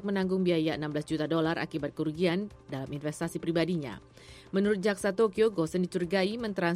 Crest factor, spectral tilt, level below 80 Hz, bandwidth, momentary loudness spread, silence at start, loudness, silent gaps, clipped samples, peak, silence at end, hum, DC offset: 16 dB; -6 dB/octave; -60 dBFS; 15 kHz; 8 LU; 0 s; -30 LUFS; none; under 0.1%; -14 dBFS; 0 s; none; under 0.1%